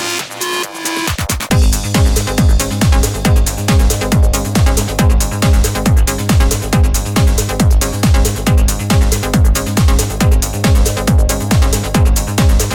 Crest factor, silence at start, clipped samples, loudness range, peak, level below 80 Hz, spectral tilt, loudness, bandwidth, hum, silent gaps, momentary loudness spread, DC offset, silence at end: 12 dB; 0 s; under 0.1%; 0 LU; 0 dBFS; -14 dBFS; -5 dB/octave; -13 LUFS; 19 kHz; none; none; 2 LU; under 0.1%; 0 s